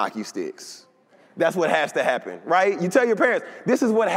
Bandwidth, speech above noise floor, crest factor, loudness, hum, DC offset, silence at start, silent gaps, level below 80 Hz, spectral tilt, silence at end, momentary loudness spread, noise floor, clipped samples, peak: 16 kHz; 34 dB; 18 dB; -22 LUFS; none; under 0.1%; 0 s; none; -78 dBFS; -5 dB/octave; 0 s; 12 LU; -56 dBFS; under 0.1%; -6 dBFS